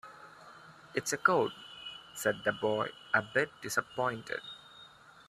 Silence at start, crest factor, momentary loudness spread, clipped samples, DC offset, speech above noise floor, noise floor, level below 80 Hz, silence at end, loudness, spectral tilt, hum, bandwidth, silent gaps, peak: 0.05 s; 24 dB; 24 LU; under 0.1%; under 0.1%; 24 dB; -56 dBFS; -74 dBFS; 0.45 s; -33 LUFS; -3.5 dB/octave; none; 15 kHz; none; -12 dBFS